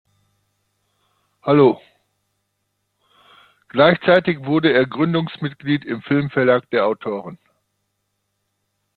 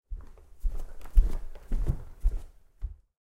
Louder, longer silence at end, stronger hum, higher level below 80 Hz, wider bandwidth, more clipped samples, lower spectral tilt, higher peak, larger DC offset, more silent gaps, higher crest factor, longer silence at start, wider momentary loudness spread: first, -18 LUFS vs -35 LUFS; first, 1.6 s vs 0.3 s; first, 50 Hz at -50 dBFS vs none; second, -60 dBFS vs -30 dBFS; first, 4.8 kHz vs 3.1 kHz; neither; about the same, -9 dB/octave vs -8 dB/octave; first, -2 dBFS vs -8 dBFS; neither; neither; about the same, 18 dB vs 20 dB; first, 1.45 s vs 0.1 s; second, 13 LU vs 16 LU